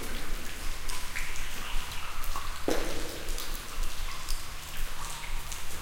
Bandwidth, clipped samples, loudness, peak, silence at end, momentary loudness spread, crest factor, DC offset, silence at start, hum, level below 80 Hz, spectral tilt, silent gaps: 17 kHz; under 0.1%; -37 LUFS; -12 dBFS; 0 s; 6 LU; 18 dB; under 0.1%; 0 s; none; -34 dBFS; -2.5 dB/octave; none